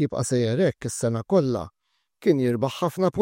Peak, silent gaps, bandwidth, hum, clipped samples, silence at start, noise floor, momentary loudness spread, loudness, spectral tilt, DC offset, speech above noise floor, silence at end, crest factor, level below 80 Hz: -8 dBFS; none; 16 kHz; none; under 0.1%; 0 s; -59 dBFS; 6 LU; -24 LUFS; -6 dB/octave; under 0.1%; 36 dB; 0 s; 16 dB; -58 dBFS